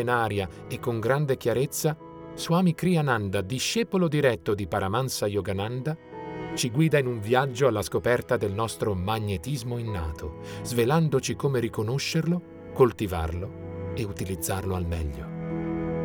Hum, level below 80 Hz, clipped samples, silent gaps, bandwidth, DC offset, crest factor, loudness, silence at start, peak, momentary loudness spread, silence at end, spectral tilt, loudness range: none; -46 dBFS; under 0.1%; none; over 20 kHz; under 0.1%; 18 dB; -27 LUFS; 0 s; -8 dBFS; 11 LU; 0 s; -5.5 dB/octave; 3 LU